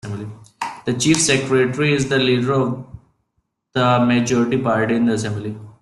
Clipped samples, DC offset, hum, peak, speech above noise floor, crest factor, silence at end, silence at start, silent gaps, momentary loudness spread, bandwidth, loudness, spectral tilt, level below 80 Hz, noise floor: under 0.1%; under 0.1%; none; -2 dBFS; 54 dB; 16 dB; 0.1 s; 0.05 s; none; 14 LU; 12 kHz; -18 LUFS; -4.5 dB/octave; -52 dBFS; -71 dBFS